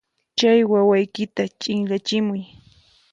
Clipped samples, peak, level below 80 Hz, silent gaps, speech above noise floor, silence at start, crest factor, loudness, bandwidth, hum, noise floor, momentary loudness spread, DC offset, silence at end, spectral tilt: under 0.1%; -6 dBFS; -64 dBFS; none; 35 dB; 0.35 s; 16 dB; -20 LUFS; 7.8 kHz; none; -55 dBFS; 10 LU; under 0.1%; 0.65 s; -5.5 dB/octave